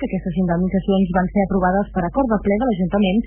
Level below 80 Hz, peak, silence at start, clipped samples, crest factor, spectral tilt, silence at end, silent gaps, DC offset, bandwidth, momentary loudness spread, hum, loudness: -34 dBFS; -6 dBFS; 0 s; under 0.1%; 12 dB; -12 dB/octave; 0 s; none; under 0.1%; 3.4 kHz; 3 LU; none; -19 LUFS